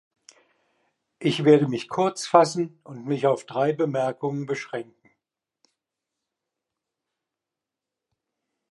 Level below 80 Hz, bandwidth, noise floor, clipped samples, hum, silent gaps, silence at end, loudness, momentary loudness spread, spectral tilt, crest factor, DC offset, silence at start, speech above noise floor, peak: -76 dBFS; 11.5 kHz; -87 dBFS; under 0.1%; none; none; 3.9 s; -23 LUFS; 12 LU; -6 dB/octave; 24 dB; under 0.1%; 1.2 s; 64 dB; -2 dBFS